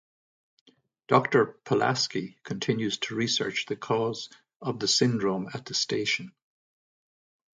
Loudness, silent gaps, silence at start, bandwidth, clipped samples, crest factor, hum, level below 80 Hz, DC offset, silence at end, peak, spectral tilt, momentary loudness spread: -27 LUFS; 4.56-4.60 s; 1.1 s; 10 kHz; under 0.1%; 22 dB; none; -70 dBFS; under 0.1%; 1.3 s; -6 dBFS; -4 dB/octave; 12 LU